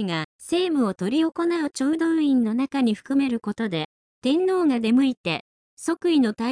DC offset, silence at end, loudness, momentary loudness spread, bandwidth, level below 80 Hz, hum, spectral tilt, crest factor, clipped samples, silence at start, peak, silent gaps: under 0.1%; 0 s; -23 LUFS; 8 LU; 10.5 kHz; -66 dBFS; none; -5.5 dB/octave; 12 dB; under 0.1%; 0 s; -12 dBFS; 0.24-0.39 s, 3.85-4.22 s, 5.17-5.24 s, 5.40-5.77 s